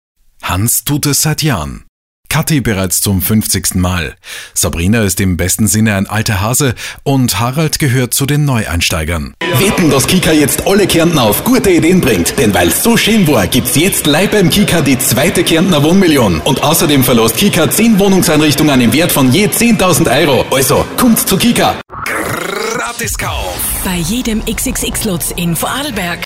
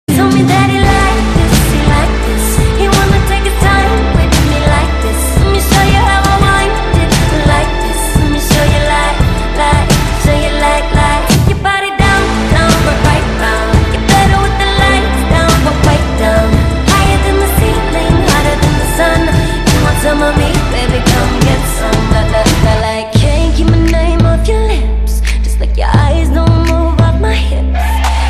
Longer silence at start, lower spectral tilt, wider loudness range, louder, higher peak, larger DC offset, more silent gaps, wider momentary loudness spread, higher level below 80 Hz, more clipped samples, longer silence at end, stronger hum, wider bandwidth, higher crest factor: first, 0.45 s vs 0.1 s; about the same, -4 dB/octave vs -5 dB/octave; first, 5 LU vs 1 LU; about the same, -11 LUFS vs -10 LUFS; about the same, 0 dBFS vs 0 dBFS; neither; first, 1.89-2.23 s vs none; first, 7 LU vs 4 LU; second, -30 dBFS vs -14 dBFS; neither; about the same, 0 s vs 0 s; neither; first, 16.5 kHz vs 14.5 kHz; about the same, 12 dB vs 10 dB